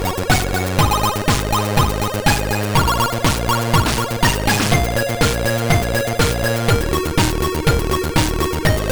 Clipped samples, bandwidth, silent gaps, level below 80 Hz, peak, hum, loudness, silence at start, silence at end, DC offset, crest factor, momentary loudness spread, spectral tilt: under 0.1%; over 20 kHz; none; -26 dBFS; -2 dBFS; none; -17 LUFS; 0 s; 0 s; under 0.1%; 16 dB; 3 LU; -4.5 dB/octave